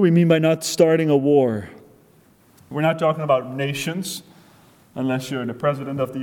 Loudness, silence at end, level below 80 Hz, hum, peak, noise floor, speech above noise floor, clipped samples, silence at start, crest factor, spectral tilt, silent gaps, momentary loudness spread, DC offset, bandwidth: -20 LUFS; 0 s; -62 dBFS; none; -4 dBFS; -54 dBFS; 35 dB; under 0.1%; 0 s; 18 dB; -6 dB/octave; none; 14 LU; under 0.1%; 18 kHz